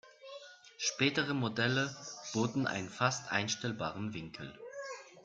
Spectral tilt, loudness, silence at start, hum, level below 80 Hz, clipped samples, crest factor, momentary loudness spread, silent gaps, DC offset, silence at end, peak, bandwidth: -4 dB/octave; -35 LUFS; 0.05 s; none; -72 dBFS; under 0.1%; 22 dB; 16 LU; none; under 0.1%; 0.05 s; -14 dBFS; 9.2 kHz